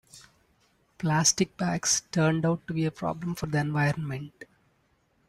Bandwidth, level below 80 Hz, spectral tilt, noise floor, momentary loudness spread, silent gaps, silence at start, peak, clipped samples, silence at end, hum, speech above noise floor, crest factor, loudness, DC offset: 14 kHz; -60 dBFS; -4 dB/octave; -69 dBFS; 10 LU; none; 0.15 s; -8 dBFS; under 0.1%; 0.85 s; none; 42 dB; 20 dB; -27 LUFS; under 0.1%